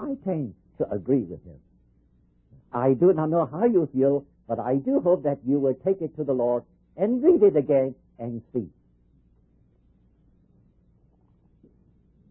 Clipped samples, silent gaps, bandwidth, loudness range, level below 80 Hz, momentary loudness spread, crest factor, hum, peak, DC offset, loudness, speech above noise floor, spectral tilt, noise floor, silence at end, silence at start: under 0.1%; none; 3.2 kHz; 9 LU; -60 dBFS; 14 LU; 18 dB; none; -8 dBFS; under 0.1%; -24 LUFS; 39 dB; -13.5 dB/octave; -62 dBFS; 3.6 s; 0 s